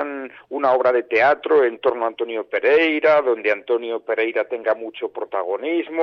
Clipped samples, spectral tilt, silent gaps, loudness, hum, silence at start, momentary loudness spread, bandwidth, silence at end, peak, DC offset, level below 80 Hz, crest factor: under 0.1%; -5.5 dB/octave; none; -20 LUFS; none; 0 s; 10 LU; 6.2 kHz; 0 s; -6 dBFS; under 0.1%; -68 dBFS; 12 dB